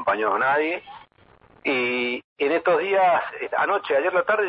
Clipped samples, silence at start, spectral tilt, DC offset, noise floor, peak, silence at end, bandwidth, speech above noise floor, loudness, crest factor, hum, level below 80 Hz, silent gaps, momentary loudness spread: under 0.1%; 0 s; -7.5 dB/octave; under 0.1%; -55 dBFS; -10 dBFS; 0 s; 5.6 kHz; 33 dB; -22 LUFS; 12 dB; none; -68 dBFS; 2.24-2.36 s; 8 LU